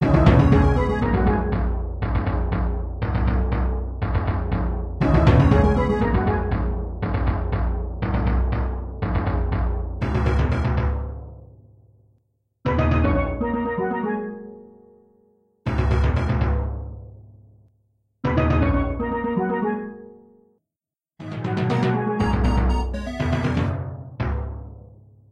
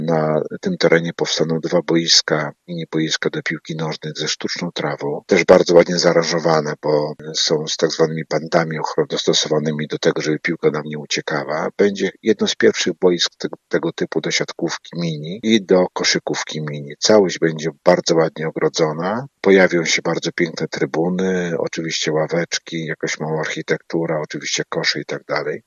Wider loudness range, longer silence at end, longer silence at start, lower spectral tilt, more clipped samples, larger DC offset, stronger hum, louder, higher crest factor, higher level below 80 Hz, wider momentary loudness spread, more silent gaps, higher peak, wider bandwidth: about the same, 6 LU vs 5 LU; first, 0.5 s vs 0.05 s; about the same, 0 s vs 0 s; first, -9 dB/octave vs -4 dB/octave; neither; neither; neither; second, -22 LUFS vs -18 LUFS; about the same, 20 dB vs 18 dB; first, -26 dBFS vs -62 dBFS; first, 13 LU vs 10 LU; neither; about the same, -2 dBFS vs 0 dBFS; second, 7 kHz vs 7.8 kHz